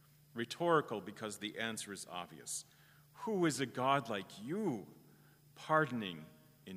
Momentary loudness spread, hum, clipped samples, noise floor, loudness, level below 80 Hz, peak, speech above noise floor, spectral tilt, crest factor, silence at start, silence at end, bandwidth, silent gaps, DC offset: 15 LU; none; under 0.1%; -64 dBFS; -38 LUFS; -82 dBFS; -18 dBFS; 26 dB; -4.5 dB/octave; 22 dB; 0.35 s; 0 s; 15.5 kHz; none; under 0.1%